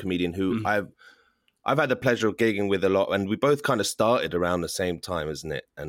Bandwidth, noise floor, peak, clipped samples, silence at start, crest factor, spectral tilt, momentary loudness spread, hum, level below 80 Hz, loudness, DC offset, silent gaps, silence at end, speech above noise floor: 16.5 kHz; -64 dBFS; -10 dBFS; under 0.1%; 0 s; 16 dB; -5 dB/octave; 7 LU; none; -58 dBFS; -25 LUFS; under 0.1%; none; 0 s; 39 dB